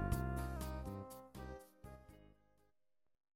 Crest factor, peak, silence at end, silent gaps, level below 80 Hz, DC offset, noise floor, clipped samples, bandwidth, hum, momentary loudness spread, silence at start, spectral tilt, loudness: 22 dB; -24 dBFS; 1.05 s; none; -50 dBFS; under 0.1%; -86 dBFS; under 0.1%; 16.5 kHz; none; 19 LU; 0 s; -6.5 dB/octave; -46 LUFS